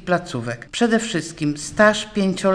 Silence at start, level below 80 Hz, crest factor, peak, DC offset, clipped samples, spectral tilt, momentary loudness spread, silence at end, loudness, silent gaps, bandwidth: 0 s; -50 dBFS; 18 dB; -2 dBFS; under 0.1%; under 0.1%; -4.5 dB/octave; 11 LU; 0 s; -20 LUFS; none; 10.5 kHz